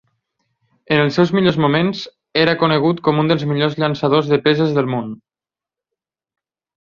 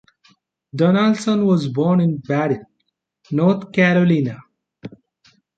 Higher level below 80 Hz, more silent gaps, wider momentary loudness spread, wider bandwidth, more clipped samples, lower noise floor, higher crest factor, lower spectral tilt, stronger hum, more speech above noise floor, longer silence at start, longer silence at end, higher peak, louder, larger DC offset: first, -56 dBFS vs -62 dBFS; neither; second, 7 LU vs 24 LU; second, 7.2 kHz vs 8.8 kHz; neither; first, -90 dBFS vs -73 dBFS; about the same, 18 dB vs 16 dB; about the same, -7.5 dB/octave vs -7.5 dB/octave; neither; first, 74 dB vs 56 dB; first, 0.9 s vs 0.75 s; first, 1.7 s vs 0.7 s; about the same, 0 dBFS vs -2 dBFS; about the same, -16 LUFS vs -18 LUFS; neither